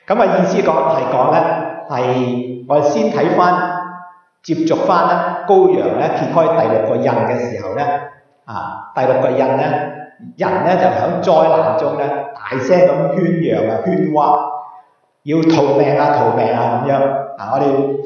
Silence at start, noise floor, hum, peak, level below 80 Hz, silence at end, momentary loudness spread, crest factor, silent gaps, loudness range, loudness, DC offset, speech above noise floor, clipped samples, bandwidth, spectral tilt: 0.1 s; -47 dBFS; none; 0 dBFS; -64 dBFS; 0 s; 11 LU; 14 dB; none; 3 LU; -15 LUFS; under 0.1%; 33 dB; under 0.1%; 7 kHz; -7.5 dB/octave